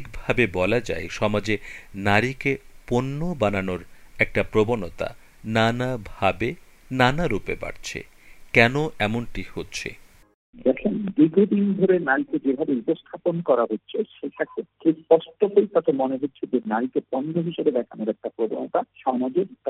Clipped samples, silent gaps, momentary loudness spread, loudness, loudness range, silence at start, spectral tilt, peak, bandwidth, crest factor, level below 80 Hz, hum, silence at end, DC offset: under 0.1%; 10.34-10.53 s; 12 LU; -24 LUFS; 3 LU; 0 s; -6.5 dB/octave; 0 dBFS; 15 kHz; 24 dB; -44 dBFS; none; 0 s; under 0.1%